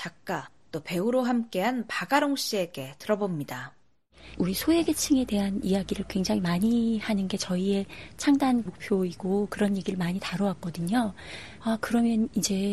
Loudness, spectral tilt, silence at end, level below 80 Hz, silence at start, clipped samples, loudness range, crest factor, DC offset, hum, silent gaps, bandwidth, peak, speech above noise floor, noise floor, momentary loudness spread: -27 LUFS; -5 dB/octave; 0 s; -54 dBFS; 0 s; under 0.1%; 3 LU; 18 dB; 0.2%; none; none; 13.5 kHz; -8 dBFS; 27 dB; -54 dBFS; 10 LU